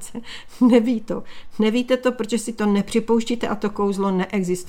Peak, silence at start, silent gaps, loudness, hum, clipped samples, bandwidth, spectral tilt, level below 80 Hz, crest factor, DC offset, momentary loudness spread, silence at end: -2 dBFS; 0 s; none; -21 LUFS; none; under 0.1%; 15.5 kHz; -5.5 dB/octave; -48 dBFS; 18 dB; under 0.1%; 14 LU; 0 s